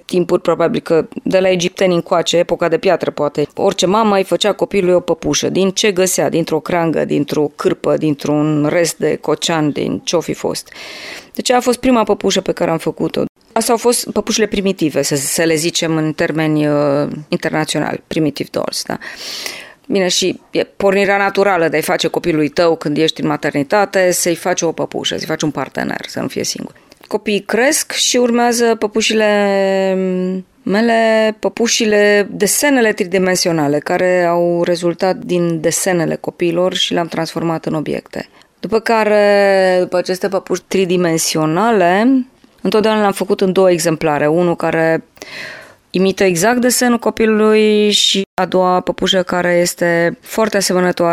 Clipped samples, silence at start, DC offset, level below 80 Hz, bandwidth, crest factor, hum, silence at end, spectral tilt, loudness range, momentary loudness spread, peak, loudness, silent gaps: under 0.1%; 0.1 s; under 0.1%; -50 dBFS; 16 kHz; 14 dB; none; 0 s; -4 dB/octave; 4 LU; 8 LU; 0 dBFS; -15 LUFS; 13.29-13.35 s, 48.26-48.37 s